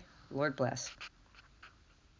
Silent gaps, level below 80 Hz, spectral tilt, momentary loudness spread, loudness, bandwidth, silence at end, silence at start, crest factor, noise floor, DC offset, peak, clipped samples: none; -66 dBFS; -4.5 dB/octave; 24 LU; -37 LUFS; 7.6 kHz; 0.5 s; 0 s; 22 dB; -64 dBFS; under 0.1%; -20 dBFS; under 0.1%